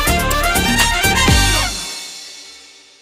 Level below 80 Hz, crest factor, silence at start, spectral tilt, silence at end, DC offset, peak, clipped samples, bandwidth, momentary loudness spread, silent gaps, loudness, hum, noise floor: -24 dBFS; 16 dB; 0 s; -3 dB/octave; 0.4 s; under 0.1%; 0 dBFS; under 0.1%; 16.5 kHz; 18 LU; none; -14 LUFS; none; -42 dBFS